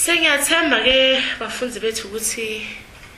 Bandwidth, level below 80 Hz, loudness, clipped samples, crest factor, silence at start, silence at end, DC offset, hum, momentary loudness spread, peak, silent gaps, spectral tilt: 15 kHz; -48 dBFS; -17 LUFS; under 0.1%; 18 dB; 0 s; 0 s; under 0.1%; none; 13 LU; -2 dBFS; none; -0.5 dB/octave